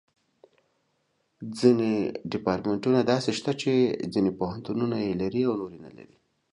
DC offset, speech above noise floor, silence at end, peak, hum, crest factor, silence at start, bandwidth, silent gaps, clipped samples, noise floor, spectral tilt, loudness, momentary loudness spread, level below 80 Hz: under 0.1%; 47 dB; 0.5 s; -6 dBFS; none; 20 dB; 1.4 s; 11 kHz; none; under 0.1%; -73 dBFS; -6.5 dB/octave; -26 LUFS; 10 LU; -60 dBFS